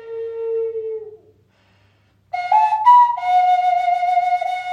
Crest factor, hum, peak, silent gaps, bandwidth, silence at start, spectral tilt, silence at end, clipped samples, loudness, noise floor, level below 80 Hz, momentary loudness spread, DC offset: 16 dB; none; -2 dBFS; none; 9.4 kHz; 0 s; -2 dB/octave; 0 s; under 0.1%; -17 LUFS; -58 dBFS; -70 dBFS; 17 LU; under 0.1%